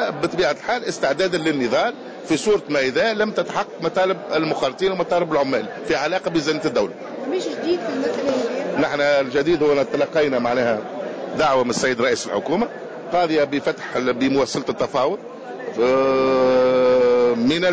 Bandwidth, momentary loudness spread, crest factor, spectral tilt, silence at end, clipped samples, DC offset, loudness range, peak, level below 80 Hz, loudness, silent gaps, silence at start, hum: 8 kHz; 8 LU; 10 dB; -4.5 dB/octave; 0 s; under 0.1%; under 0.1%; 3 LU; -8 dBFS; -56 dBFS; -20 LUFS; none; 0 s; none